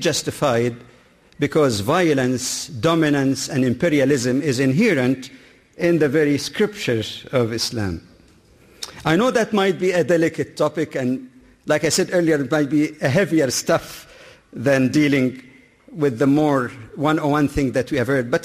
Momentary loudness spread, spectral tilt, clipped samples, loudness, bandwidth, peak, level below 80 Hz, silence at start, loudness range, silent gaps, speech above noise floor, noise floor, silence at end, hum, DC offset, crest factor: 9 LU; -5 dB/octave; under 0.1%; -19 LUFS; 15 kHz; -6 dBFS; -50 dBFS; 0 s; 3 LU; none; 32 dB; -51 dBFS; 0 s; none; under 0.1%; 14 dB